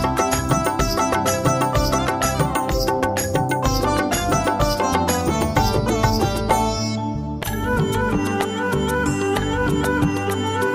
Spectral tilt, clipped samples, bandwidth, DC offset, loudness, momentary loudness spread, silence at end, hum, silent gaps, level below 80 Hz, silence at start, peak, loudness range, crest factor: -5 dB/octave; under 0.1%; 16 kHz; under 0.1%; -20 LUFS; 3 LU; 0 s; none; none; -32 dBFS; 0 s; -4 dBFS; 2 LU; 16 dB